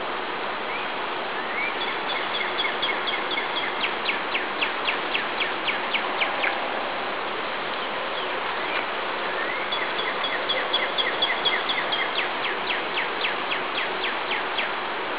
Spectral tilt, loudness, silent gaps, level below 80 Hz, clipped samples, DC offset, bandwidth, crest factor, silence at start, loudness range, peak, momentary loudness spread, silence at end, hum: 1.5 dB/octave; -25 LUFS; none; -66 dBFS; under 0.1%; 0.8%; 4 kHz; 18 dB; 0 s; 3 LU; -8 dBFS; 5 LU; 0 s; none